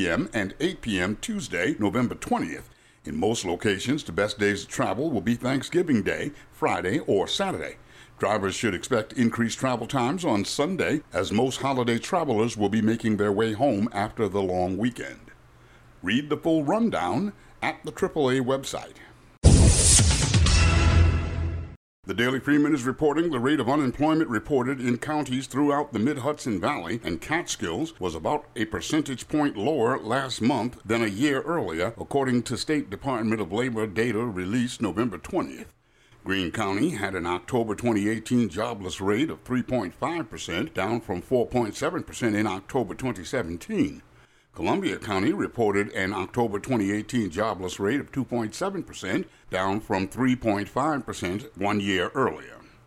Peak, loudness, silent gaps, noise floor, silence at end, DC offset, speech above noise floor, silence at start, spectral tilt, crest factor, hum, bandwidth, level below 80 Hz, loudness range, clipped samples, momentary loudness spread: -4 dBFS; -26 LUFS; 21.76-22.03 s; -57 dBFS; 0.3 s; under 0.1%; 31 dB; 0 s; -5 dB/octave; 22 dB; none; 15 kHz; -36 dBFS; 6 LU; under 0.1%; 7 LU